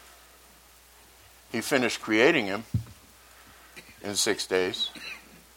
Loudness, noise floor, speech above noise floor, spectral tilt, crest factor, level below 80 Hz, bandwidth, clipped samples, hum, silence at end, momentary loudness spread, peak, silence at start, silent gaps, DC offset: -26 LUFS; -55 dBFS; 29 dB; -3.5 dB/octave; 24 dB; -58 dBFS; 17.5 kHz; under 0.1%; none; 0.35 s; 24 LU; -6 dBFS; 1.5 s; none; under 0.1%